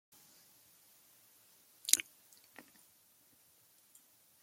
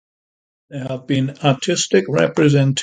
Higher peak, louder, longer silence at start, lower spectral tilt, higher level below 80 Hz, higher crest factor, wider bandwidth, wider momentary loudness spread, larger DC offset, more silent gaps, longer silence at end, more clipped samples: about the same, 0 dBFS vs -2 dBFS; second, -32 LUFS vs -17 LUFS; first, 1.85 s vs 0.7 s; second, 3 dB/octave vs -5 dB/octave; second, under -90 dBFS vs -58 dBFS; first, 44 dB vs 16 dB; first, 16.5 kHz vs 9.4 kHz; first, 27 LU vs 13 LU; neither; neither; first, 2.4 s vs 0 s; neither